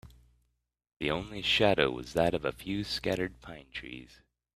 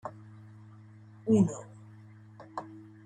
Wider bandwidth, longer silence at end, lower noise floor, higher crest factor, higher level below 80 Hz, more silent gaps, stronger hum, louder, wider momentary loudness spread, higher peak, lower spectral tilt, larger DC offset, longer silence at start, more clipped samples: first, 15 kHz vs 9.4 kHz; first, 0.5 s vs 0.25 s; first, -79 dBFS vs -52 dBFS; about the same, 24 dB vs 20 dB; first, -54 dBFS vs -72 dBFS; neither; first, 60 Hz at -55 dBFS vs none; about the same, -30 LUFS vs -30 LUFS; second, 17 LU vs 27 LU; first, -8 dBFS vs -14 dBFS; second, -5 dB/octave vs -8 dB/octave; neither; about the same, 0.05 s vs 0.05 s; neither